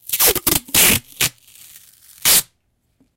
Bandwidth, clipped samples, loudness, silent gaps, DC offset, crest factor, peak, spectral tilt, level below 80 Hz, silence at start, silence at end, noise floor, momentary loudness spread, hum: 17.5 kHz; under 0.1%; -14 LUFS; none; under 0.1%; 18 dB; 0 dBFS; -0.5 dB/octave; -42 dBFS; 0.1 s; 0.75 s; -66 dBFS; 8 LU; none